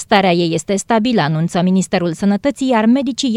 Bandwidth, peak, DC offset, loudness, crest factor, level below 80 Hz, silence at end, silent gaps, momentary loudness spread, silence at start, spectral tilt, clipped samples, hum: 12 kHz; 0 dBFS; under 0.1%; -15 LUFS; 14 dB; -50 dBFS; 0 s; none; 4 LU; 0 s; -5.5 dB/octave; under 0.1%; none